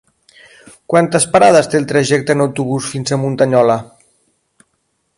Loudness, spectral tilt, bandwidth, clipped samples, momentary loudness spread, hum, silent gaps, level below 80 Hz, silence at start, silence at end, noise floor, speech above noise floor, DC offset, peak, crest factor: -13 LUFS; -5 dB/octave; 11.5 kHz; under 0.1%; 9 LU; none; none; -54 dBFS; 0.9 s; 1.35 s; -66 dBFS; 53 dB; under 0.1%; 0 dBFS; 16 dB